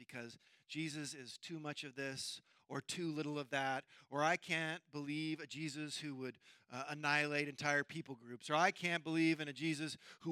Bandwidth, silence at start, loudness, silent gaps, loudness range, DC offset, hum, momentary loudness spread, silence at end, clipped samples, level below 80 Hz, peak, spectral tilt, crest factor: 14.5 kHz; 0 s; -40 LUFS; none; 6 LU; under 0.1%; none; 14 LU; 0 s; under 0.1%; -90 dBFS; -18 dBFS; -4 dB/octave; 22 dB